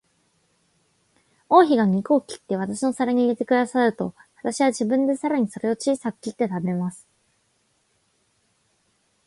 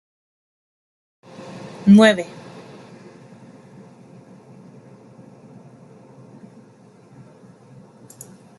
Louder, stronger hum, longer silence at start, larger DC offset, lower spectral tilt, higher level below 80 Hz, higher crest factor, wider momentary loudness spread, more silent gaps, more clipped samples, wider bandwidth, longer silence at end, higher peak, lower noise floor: second, -22 LUFS vs -14 LUFS; neither; about the same, 1.5 s vs 1.55 s; neither; about the same, -6 dB/octave vs -6.5 dB/octave; about the same, -68 dBFS vs -66 dBFS; about the same, 20 dB vs 22 dB; second, 12 LU vs 31 LU; neither; neither; about the same, 11.5 kHz vs 12 kHz; second, 2.3 s vs 6.35 s; about the same, -4 dBFS vs -2 dBFS; first, -68 dBFS vs -49 dBFS